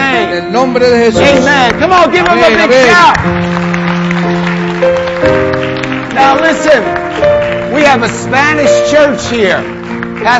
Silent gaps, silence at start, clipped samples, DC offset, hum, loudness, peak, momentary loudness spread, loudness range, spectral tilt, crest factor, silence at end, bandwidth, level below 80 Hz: none; 0 s; 0.6%; under 0.1%; none; -8 LUFS; 0 dBFS; 8 LU; 4 LU; -5 dB/octave; 8 dB; 0 s; 9.8 kHz; -34 dBFS